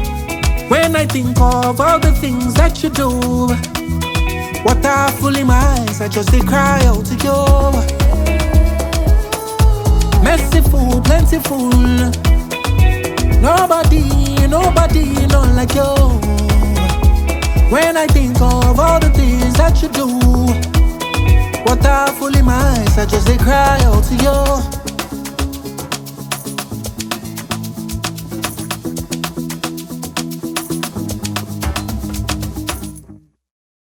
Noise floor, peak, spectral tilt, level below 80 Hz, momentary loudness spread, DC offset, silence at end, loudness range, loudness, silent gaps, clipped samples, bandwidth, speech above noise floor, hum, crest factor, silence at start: -41 dBFS; 0 dBFS; -5.5 dB/octave; -16 dBFS; 11 LU; under 0.1%; 0.8 s; 10 LU; -14 LUFS; none; under 0.1%; 19 kHz; 30 dB; none; 12 dB; 0 s